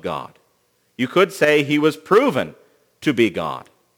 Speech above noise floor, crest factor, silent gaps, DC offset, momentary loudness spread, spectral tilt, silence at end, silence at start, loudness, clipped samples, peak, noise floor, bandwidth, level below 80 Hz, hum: 46 dB; 18 dB; none; under 0.1%; 13 LU; -5.5 dB/octave; 0.4 s; 0.05 s; -19 LUFS; under 0.1%; -2 dBFS; -64 dBFS; over 20 kHz; -62 dBFS; 60 Hz at -55 dBFS